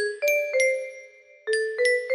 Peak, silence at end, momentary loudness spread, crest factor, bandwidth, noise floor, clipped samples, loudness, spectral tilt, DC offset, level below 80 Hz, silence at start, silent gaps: -10 dBFS; 0 s; 16 LU; 14 dB; 13 kHz; -48 dBFS; under 0.1%; -24 LUFS; 1 dB/octave; under 0.1%; -76 dBFS; 0 s; none